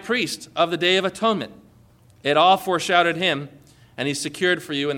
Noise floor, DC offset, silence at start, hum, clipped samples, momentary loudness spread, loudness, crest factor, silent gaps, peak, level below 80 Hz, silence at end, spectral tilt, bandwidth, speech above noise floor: -53 dBFS; under 0.1%; 0 s; none; under 0.1%; 11 LU; -21 LUFS; 18 dB; none; -4 dBFS; -64 dBFS; 0 s; -3.5 dB/octave; 17.5 kHz; 32 dB